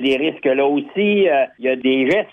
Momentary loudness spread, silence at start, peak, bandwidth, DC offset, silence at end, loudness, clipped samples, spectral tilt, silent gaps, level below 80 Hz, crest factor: 3 LU; 0 s; -6 dBFS; 8 kHz; under 0.1%; 0.05 s; -17 LUFS; under 0.1%; -6.5 dB/octave; none; -62 dBFS; 12 dB